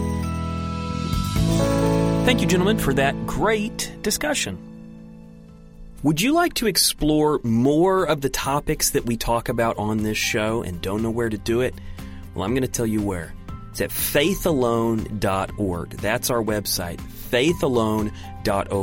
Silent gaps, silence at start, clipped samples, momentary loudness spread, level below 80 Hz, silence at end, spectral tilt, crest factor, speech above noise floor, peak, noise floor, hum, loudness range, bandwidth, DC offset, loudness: none; 0 s; under 0.1%; 10 LU; -36 dBFS; 0 s; -4.5 dB/octave; 18 dB; 22 dB; -4 dBFS; -43 dBFS; none; 4 LU; 16.5 kHz; under 0.1%; -22 LUFS